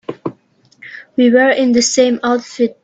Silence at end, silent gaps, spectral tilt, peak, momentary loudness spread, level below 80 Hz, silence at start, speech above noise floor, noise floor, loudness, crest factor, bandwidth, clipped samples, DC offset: 0.1 s; none; -3 dB/octave; 0 dBFS; 18 LU; -60 dBFS; 0.1 s; 40 dB; -52 dBFS; -13 LUFS; 14 dB; 8.4 kHz; under 0.1%; under 0.1%